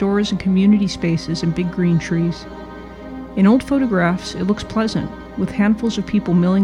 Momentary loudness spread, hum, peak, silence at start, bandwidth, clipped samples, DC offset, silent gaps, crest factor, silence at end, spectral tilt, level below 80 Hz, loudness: 15 LU; none; -4 dBFS; 0 s; 10.5 kHz; under 0.1%; under 0.1%; none; 14 dB; 0 s; -7 dB/octave; -40 dBFS; -18 LUFS